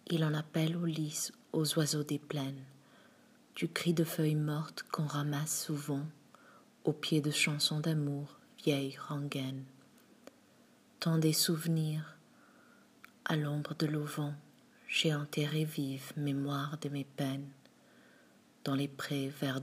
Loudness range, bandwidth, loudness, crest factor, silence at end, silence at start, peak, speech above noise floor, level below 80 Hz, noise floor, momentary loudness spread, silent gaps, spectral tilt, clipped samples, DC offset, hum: 4 LU; 15.5 kHz; -35 LUFS; 18 dB; 0 s; 0.05 s; -18 dBFS; 30 dB; -84 dBFS; -64 dBFS; 11 LU; none; -4.5 dB/octave; under 0.1%; under 0.1%; none